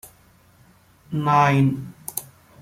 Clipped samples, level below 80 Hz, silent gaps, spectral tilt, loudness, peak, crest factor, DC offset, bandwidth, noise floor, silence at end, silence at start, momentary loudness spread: under 0.1%; -58 dBFS; none; -6 dB/octave; -21 LUFS; -6 dBFS; 18 dB; under 0.1%; 16.5 kHz; -55 dBFS; 0.4 s; 1.1 s; 15 LU